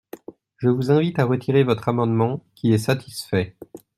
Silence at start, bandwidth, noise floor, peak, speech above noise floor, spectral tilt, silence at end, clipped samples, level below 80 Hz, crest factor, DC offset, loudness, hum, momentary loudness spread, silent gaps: 0.15 s; 14.5 kHz; -41 dBFS; -4 dBFS; 21 dB; -7 dB/octave; 0.2 s; under 0.1%; -58 dBFS; 18 dB; under 0.1%; -21 LUFS; none; 7 LU; none